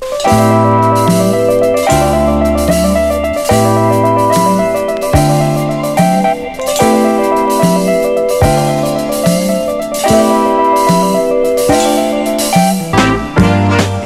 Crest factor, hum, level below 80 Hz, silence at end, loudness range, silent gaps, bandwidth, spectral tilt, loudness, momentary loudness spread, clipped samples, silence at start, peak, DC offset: 10 dB; none; -30 dBFS; 0 s; 1 LU; none; 16.5 kHz; -5.5 dB/octave; -11 LUFS; 4 LU; under 0.1%; 0 s; 0 dBFS; under 0.1%